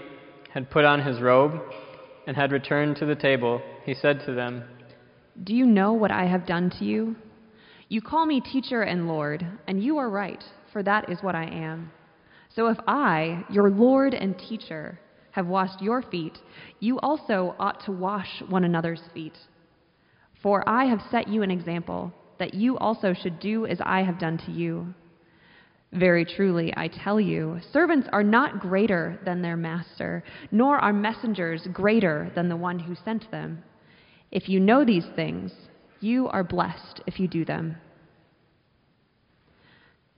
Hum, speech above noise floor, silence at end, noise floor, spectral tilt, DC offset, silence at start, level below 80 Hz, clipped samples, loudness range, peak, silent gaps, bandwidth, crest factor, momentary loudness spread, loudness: none; 41 dB; 2.4 s; -66 dBFS; -5 dB/octave; under 0.1%; 0 s; -62 dBFS; under 0.1%; 5 LU; -4 dBFS; none; 5.4 kHz; 22 dB; 15 LU; -25 LUFS